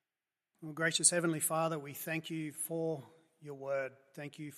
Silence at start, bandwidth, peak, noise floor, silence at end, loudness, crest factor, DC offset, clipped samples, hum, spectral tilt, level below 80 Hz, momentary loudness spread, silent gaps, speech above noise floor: 0.6 s; 14.5 kHz; -12 dBFS; under -90 dBFS; 0 s; -34 LUFS; 24 dB; under 0.1%; under 0.1%; none; -3 dB/octave; -86 dBFS; 20 LU; none; over 54 dB